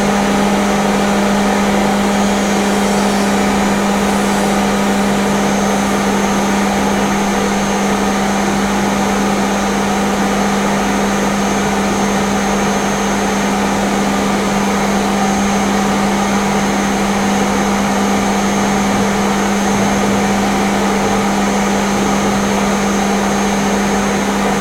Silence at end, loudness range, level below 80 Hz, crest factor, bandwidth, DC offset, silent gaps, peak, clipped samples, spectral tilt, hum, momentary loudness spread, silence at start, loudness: 0 s; 1 LU; -34 dBFS; 12 dB; 16.5 kHz; under 0.1%; none; 0 dBFS; under 0.1%; -4.5 dB/octave; none; 1 LU; 0 s; -14 LUFS